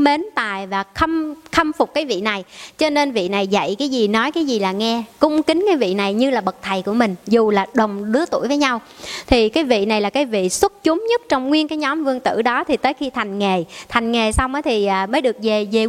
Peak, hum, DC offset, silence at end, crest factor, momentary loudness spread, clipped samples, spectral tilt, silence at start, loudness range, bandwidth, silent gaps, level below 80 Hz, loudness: 0 dBFS; none; under 0.1%; 0 s; 18 dB; 5 LU; under 0.1%; -4.5 dB/octave; 0 s; 2 LU; 15.5 kHz; none; -40 dBFS; -18 LUFS